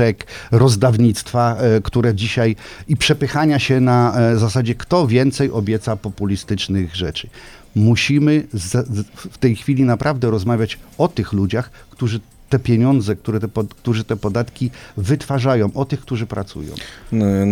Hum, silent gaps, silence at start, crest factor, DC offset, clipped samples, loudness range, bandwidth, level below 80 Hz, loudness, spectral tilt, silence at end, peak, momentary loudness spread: none; none; 0 s; 16 dB; under 0.1%; under 0.1%; 4 LU; 14 kHz; -42 dBFS; -18 LUFS; -6.5 dB/octave; 0 s; 0 dBFS; 11 LU